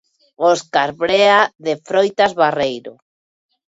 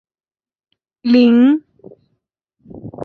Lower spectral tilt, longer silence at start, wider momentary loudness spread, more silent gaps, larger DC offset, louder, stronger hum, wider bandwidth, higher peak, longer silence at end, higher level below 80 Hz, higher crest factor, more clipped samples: second, -3.5 dB/octave vs -7.5 dB/octave; second, 0.4 s vs 1.05 s; second, 9 LU vs 24 LU; neither; neither; second, -16 LUFS vs -13 LUFS; neither; first, 8 kHz vs 4.8 kHz; about the same, 0 dBFS vs -2 dBFS; first, 0.75 s vs 0 s; about the same, -58 dBFS vs -58 dBFS; about the same, 16 dB vs 16 dB; neither